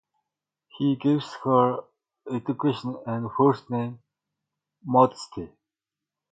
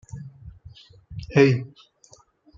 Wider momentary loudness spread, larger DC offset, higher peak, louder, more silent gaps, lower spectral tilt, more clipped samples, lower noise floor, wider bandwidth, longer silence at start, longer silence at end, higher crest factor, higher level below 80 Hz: second, 17 LU vs 25 LU; neither; about the same, -6 dBFS vs -4 dBFS; second, -25 LUFS vs -20 LUFS; neither; about the same, -8 dB/octave vs -7.5 dB/octave; neither; first, -89 dBFS vs -56 dBFS; first, 9 kHz vs 7.6 kHz; first, 0.75 s vs 0.15 s; about the same, 0.85 s vs 0.9 s; about the same, 22 dB vs 22 dB; second, -66 dBFS vs -52 dBFS